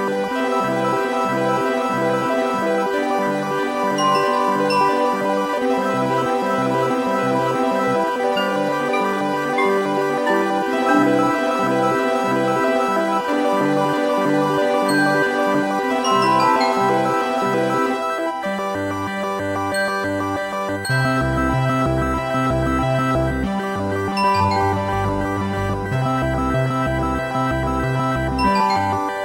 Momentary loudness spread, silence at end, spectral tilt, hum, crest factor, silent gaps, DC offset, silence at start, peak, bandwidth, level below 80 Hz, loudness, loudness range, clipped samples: 5 LU; 0 s; -6 dB/octave; none; 14 dB; none; under 0.1%; 0 s; -4 dBFS; 16 kHz; -38 dBFS; -19 LUFS; 3 LU; under 0.1%